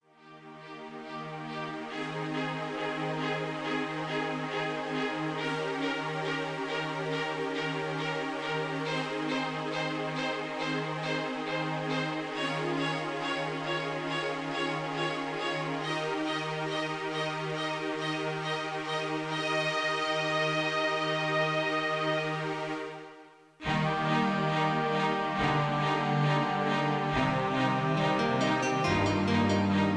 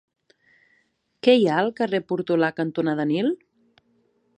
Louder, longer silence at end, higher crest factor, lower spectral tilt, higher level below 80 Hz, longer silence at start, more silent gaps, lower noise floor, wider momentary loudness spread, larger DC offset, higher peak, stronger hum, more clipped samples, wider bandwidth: second, -31 LUFS vs -22 LUFS; second, 0 s vs 1.05 s; about the same, 16 dB vs 20 dB; second, -5.5 dB/octave vs -7 dB/octave; first, -60 dBFS vs -72 dBFS; second, 0.2 s vs 1.25 s; neither; second, -53 dBFS vs -67 dBFS; about the same, 6 LU vs 8 LU; neither; second, -14 dBFS vs -4 dBFS; neither; neither; about the same, 10.5 kHz vs 9.6 kHz